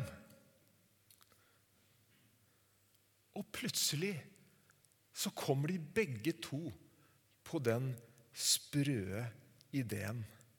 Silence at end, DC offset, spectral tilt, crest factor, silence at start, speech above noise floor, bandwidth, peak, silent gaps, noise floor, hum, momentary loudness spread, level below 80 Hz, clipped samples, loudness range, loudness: 0.2 s; under 0.1%; -4 dB/octave; 24 dB; 0 s; 34 dB; 19 kHz; -18 dBFS; none; -73 dBFS; none; 17 LU; -76 dBFS; under 0.1%; 5 LU; -39 LUFS